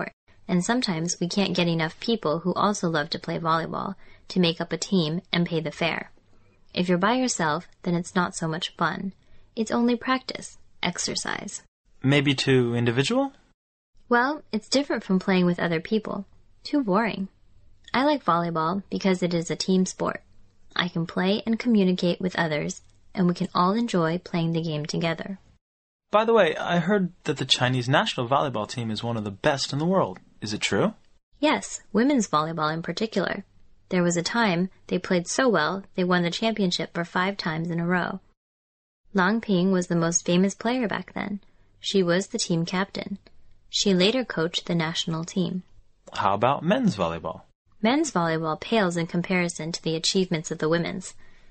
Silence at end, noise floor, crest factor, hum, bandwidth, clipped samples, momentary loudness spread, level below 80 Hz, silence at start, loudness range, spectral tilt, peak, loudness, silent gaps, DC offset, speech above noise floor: 0.15 s; -55 dBFS; 22 dB; none; 8.8 kHz; under 0.1%; 10 LU; -58 dBFS; 0 s; 2 LU; -5 dB/octave; -4 dBFS; -25 LUFS; 0.13-0.27 s, 11.68-11.85 s, 13.54-13.93 s, 25.61-25.99 s, 31.23-31.32 s, 38.37-39.04 s, 47.55-47.65 s; under 0.1%; 31 dB